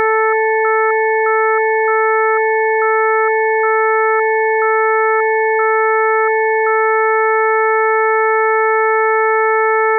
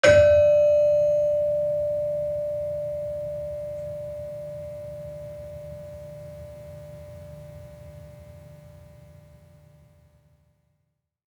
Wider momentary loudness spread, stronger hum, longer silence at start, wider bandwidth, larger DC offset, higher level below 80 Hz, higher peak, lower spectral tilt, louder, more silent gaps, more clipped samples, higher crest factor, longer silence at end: second, 1 LU vs 26 LU; neither; about the same, 0 s vs 0.05 s; second, 2.4 kHz vs 10.5 kHz; neither; second, under -90 dBFS vs -52 dBFS; about the same, -6 dBFS vs -4 dBFS; second, -1.5 dB/octave vs -5 dB/octave; first, -13 LUFS vs -23 LUFS; neither; neither; second, 8 dB vs 22 dB; second, 0 s vs 2.6 s